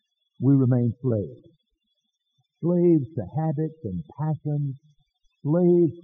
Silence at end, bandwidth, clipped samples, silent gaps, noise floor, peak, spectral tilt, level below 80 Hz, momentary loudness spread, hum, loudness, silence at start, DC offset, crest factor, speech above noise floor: 0.05 s; 3.6 kHz; under 0.1%; none; -77 dBFS; -10 dBFS; -13 dB/octave; -64 dBFS; 14 LU; none; -24 LUFS; 0.4 s; under 0.1%; 16 dB; 54 dB